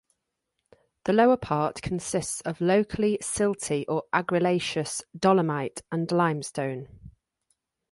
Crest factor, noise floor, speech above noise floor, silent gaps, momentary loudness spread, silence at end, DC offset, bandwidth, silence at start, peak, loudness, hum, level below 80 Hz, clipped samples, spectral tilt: 20 dB; -81 dBFS; 56 dB; none; 10 LU; 0.8 s; under 0.1%; 11.5 kHz; 1.05 s; -8 dBFS; -26 LUFS; none; -56 dBFS; under 0.1%; -5 dB/octave